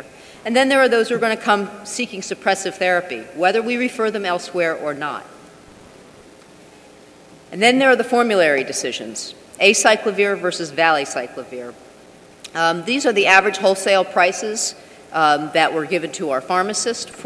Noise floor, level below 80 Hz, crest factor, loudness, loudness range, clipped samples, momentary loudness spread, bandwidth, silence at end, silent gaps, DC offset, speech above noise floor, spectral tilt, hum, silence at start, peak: -45 dBFS; -64 dBFS; 20 dB; -18 LUFS; 6 LU; under 0.1%; 13 LU; 11 kHz; 0 s; none; under 0.1%; 27 dB; -2.5 dB/octave; none; 0 s; 0 dBFS